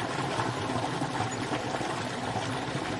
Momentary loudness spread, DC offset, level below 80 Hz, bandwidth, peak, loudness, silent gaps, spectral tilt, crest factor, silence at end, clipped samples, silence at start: 2 LU; under 0.1%; -58 dBFS; 11.5 kHz; -16 dBFS; -31 LUFS; none; -4.5 dB/octave; 16 dB; 0 s; under 0.1%; 0 s